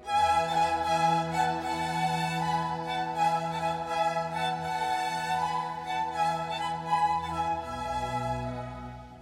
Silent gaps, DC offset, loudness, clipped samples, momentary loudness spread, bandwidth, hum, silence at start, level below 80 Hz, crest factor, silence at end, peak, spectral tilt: none; under 0.1%; -29 LUFS; under 0.1%; 7 LU; 16 kHz; none; 0 s; -52 dBFS; 16 dB; 0 s; -14 dBFS; -4.5 dB/octave